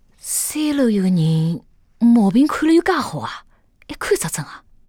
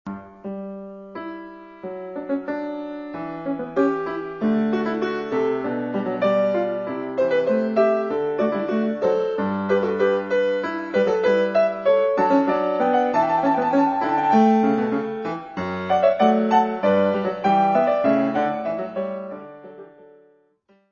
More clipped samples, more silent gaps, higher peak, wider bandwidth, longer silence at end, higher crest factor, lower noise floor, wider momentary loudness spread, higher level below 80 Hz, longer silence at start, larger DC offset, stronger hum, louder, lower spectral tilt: neither; neither; about the same, -6 dBFS vs -4 dBFS; first, 19 kHz vs 7.2 kHz; second, 0.3 s vs 1.05 s; second, 12 dB vs 18 dB; second, -38 dBFS vs -61 dBFS; about the same, 16 LU vs 15 LU; first, -50 dBFS vs -62 dBFS; first, 0.25 s vs 0.05 s; neither; neither; first, -18 LUFS vs -21 LUFS; second, -5.5 dB/octave vs -7.5 dB/octave